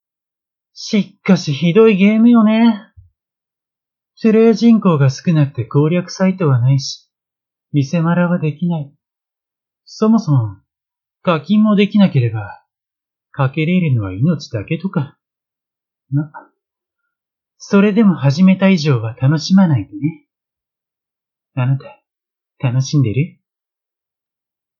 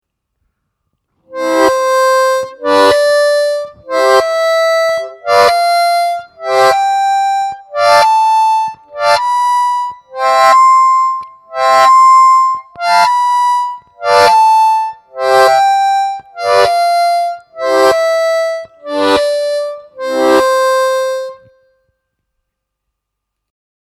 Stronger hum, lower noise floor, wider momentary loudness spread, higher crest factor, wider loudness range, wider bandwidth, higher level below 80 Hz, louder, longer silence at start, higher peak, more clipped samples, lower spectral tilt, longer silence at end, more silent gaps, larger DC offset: neither; first, -87 dBFS vs -76 dBFS; about the same, 12 LU vs 12 LU; about the same, 16 dB vs 12 dB; about the same, 7 LU vs 5 LU; second, 7.2 kHz vs 16 kHz; about the same, -60 dBFS vs -56 dBFS; second, -15 LUFS vs -11 LUFS; second, 0.75 s vs 1.3 s; about the same, 0 dBFS vs 0 dBFS; neither; first, -7.5 dB/octave vs -2 dB/octave; second, 1.5 s vs 2.5 s; neither; neither